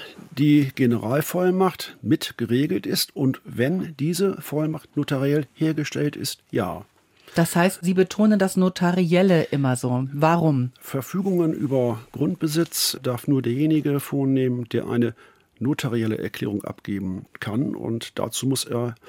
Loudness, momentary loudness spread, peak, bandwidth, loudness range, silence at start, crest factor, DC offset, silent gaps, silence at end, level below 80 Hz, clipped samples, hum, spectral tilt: -23 LUFS; 9 LU; -4 dBFS; 17 kHz; 6 LU; 0 s; 18 dB; under 0.1%; none; 0.15 s; -64 dBFS; under 0.1%; none; -6 dB/octave